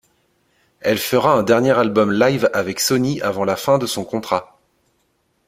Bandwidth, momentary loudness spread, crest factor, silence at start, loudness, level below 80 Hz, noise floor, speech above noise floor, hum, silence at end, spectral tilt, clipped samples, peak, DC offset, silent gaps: 16.5 kHz; 8 LU; 18 dB; 0.85 s; -18 LUFS; -56 dBFS; -65 dBFS; 48 dB; none; 1 s; -4.5 dB/octave; under 0.1%; -2 dBFS; under 0.1%; none